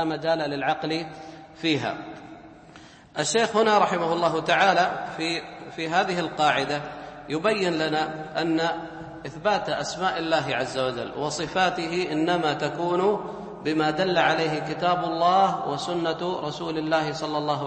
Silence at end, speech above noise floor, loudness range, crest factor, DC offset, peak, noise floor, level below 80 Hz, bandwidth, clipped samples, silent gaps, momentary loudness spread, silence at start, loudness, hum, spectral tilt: 0 s; 24 dB; 3 LU; 18 dB; under 0.1%; -6 dBFS; -48 dBFS; -60 dBFS; 8.8 kHz; under 0.1%; none; 12 LU; 0 s; -25 LUFS; none; -4.5 dB/octave